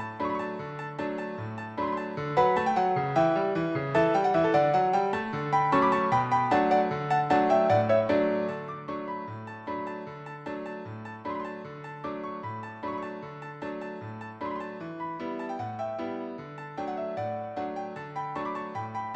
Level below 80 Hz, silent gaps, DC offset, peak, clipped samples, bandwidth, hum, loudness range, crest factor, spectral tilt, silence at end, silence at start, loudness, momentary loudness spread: -64 dBFS; none; under 0.1%; -10 dBFS; under 0.1%; 9 kHz; none; 12 LU; 20 dB; -7 dB/octave; 0 s; 0 s; -29 LUFS; 15 LU